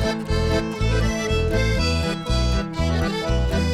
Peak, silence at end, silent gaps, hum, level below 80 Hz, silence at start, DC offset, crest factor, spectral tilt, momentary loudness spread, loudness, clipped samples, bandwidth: -8 dBFS; 0 s; none; none; -26 dBFS; 0 s; under 0.1%; 12 dB; -5.5 dB/octave; 3 LU; -22 LUFS; under 0.1%; 14 kHz